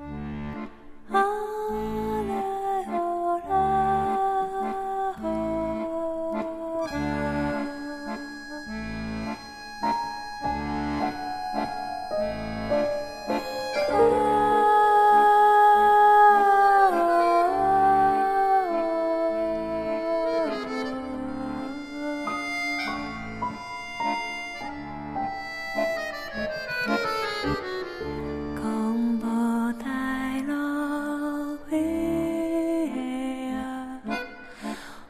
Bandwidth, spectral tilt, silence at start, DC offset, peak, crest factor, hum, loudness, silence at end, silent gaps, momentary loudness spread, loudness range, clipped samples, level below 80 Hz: 15 kHz; -5.5 dB/octave; 0 s; under 0.1%; -8 dBFS; 16 dB; none; -25 LUFS; 0 s; none; 16 LU; 12 LU; under 0.1%; -48 dBFS